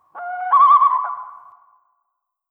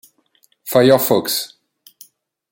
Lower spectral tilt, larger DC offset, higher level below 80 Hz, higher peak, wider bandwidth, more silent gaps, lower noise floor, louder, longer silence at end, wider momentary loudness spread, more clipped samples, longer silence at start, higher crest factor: second, -2.5 dB/octave vs -4.5 dB/octave; neither; second, -80 dBFS vs -62 dBFS; about the same, -4 dBFS vs -2 dBFS; second, 3.7 kHz vs 17 kHz; neither; first, -76 dBFS vs -60 dBFS; about the same, -14 LUFS vs -15 LUFS; about the same, 1.15 s vs 1.05 s; about the same, 19 LU vs 19 LU; neither; second, 0.15 s vs 0.65 s; about the same, 16 dB vs 18 dB